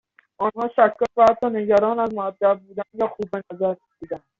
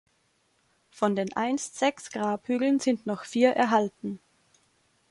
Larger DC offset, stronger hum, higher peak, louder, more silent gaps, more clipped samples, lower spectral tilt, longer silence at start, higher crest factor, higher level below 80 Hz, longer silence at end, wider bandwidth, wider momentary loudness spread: neither; neither; first, -4 dBFS vs -10 dBFS; first, -21 LUFS vs -27 LUFS; neither; neither; about the same, -4.5 dB/octave vs -4.5 dB/octave; second, 0.4 s vs 0.95 s; about the same, 18 dB vs 20 dB; first, -60 dBFS vs -72 dBFS; second, 0.2 s vs 0.95 s; second, 7.4 kHz vs 11.5 kHz; first, 14 LU vs 9 LU